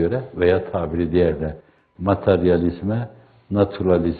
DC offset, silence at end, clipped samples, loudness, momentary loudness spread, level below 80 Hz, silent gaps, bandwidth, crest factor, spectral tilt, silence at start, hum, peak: under 0.1%; 0 s; under 0.1%; -21 LUFS; 10 LU; -44 dBFS; none; 4.7 kHz; 18 dB; -11.5 dB/octave; 0 s; none; -2 dBFS